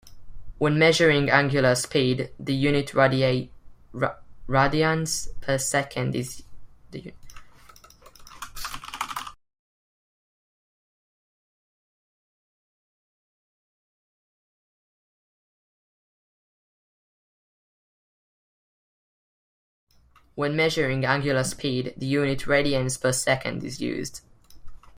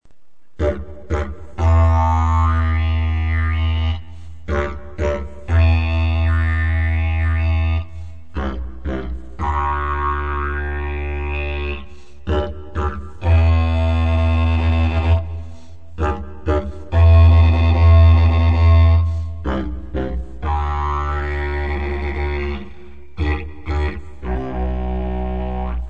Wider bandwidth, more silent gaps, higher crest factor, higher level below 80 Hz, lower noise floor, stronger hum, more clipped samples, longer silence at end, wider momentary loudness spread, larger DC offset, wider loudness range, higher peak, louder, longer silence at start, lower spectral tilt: first, 16 kHz vs 4.9 kHz; first, 9.59-19.87 s vs none; first, 24 dB vs 14 dB; second, -50 dBFS vs -22 dBFS; first, -58 dBFS vs -54 dBFS; neither; neither; about the same, 0 s vs 0 s; first, 21 LU vs 14 LU; second, under 0.1% vs 2%; first, 17 LU vs 10 LU; about the same, -4 dBFS vs -2 dBFS; second, -24 LUFS vs -19 LUFS; about the same, 0.05 s vs 0 s; second, -4.5 dB/octave vs -8.5 dB/octave